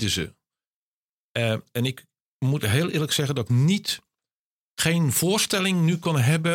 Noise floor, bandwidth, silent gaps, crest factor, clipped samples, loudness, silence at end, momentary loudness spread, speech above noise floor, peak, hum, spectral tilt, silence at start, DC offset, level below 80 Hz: under -90 dBFS; 17 kHz; 0.67-1.35 s, 2.22-2.40 s, 4.32-4.77 s; 18 dB; under 0.1%; -23 LUFS; 0 s; 9 LU; over 67 dB; -6 dBFS; none; -4.5 dB/octave; 0 s; under 0.1%; -56 dBFS